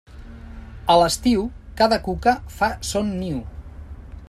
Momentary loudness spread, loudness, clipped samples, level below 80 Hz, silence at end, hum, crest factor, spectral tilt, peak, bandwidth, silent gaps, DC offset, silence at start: 23 LU; -21 LUFS; under 0.1%; -38 dBFS; 0.05 s; none; 20 dB; -4.5 dB/octave; -2 dBFS; 14.5 kHz; none; under 0.1%; 0.1 s